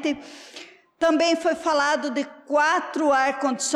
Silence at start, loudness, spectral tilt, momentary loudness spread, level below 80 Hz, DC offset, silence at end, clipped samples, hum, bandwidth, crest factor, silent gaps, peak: 0 s; -22 LUFS; -1.5 dB/octave; 18 LU; -66 dBFS; under 0.1%; 0 s; under 0.1%; none; 13 kHz; 12 dB; none; -12 dBFS